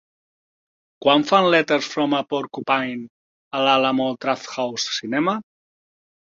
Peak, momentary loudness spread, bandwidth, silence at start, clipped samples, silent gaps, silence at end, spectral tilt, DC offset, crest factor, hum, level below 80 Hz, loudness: -2 dBFS; 11 LU; 7.6 kHz; 1 s; under 0.1%; 3.10-3.51 s; 0.9 s; -4 dB/octave; under 0.1%; 20 dB; none; -68 dBFS; -20 LUFS